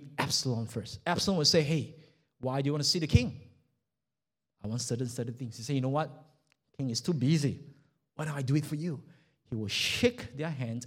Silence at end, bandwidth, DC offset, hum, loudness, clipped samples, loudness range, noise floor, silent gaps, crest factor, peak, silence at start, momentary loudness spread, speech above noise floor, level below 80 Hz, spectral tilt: 0 s; 16 kHz; under 0.1%; none; -31 LUFS; under 0.1%; 6 LU; under -90 dBFS; none; 22 dB; -10 dBFS; 0 s; 14 LU; over 59 dB; -52 dBFS; -4.5 dB/octave